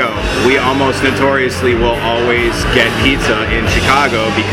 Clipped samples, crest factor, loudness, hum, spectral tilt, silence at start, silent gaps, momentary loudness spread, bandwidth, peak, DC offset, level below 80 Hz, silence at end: under 0.1%; 12 dB; -12 LUFS; none; -4.5 dB/octave; 0 s; none; 3 LU; 17 kHz; 0 dBFS; under 0.1%; -26 dBFS; 0 s